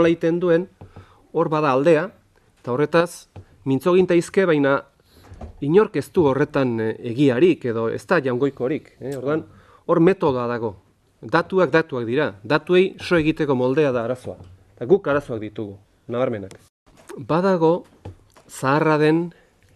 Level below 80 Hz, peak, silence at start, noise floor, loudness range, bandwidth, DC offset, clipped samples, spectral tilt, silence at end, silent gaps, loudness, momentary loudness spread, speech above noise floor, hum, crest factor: -54 dBFS; -2 dBFS; 0 s; -46 dBFS; 4 LU; 13 kHz; under 0.1%; under 0.1%; -7 dB/octave; 0.45 s; 16.69-16.86 s; -20 LUFS; 15 LU; 27 dB; none; 18 dB